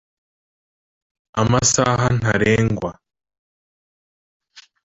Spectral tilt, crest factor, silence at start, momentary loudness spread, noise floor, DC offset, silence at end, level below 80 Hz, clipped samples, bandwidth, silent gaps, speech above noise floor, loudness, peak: -4.5 dB/octave; 20 dB; 1.35 s; 11 LU; under -90 dBFS; under 0.1%; 0.25 s; -44 dBFS; under 0.1%; 8.2 kHz; 3.38-4.40 s; over 73 dB; -18 LUFS; -2 dBFS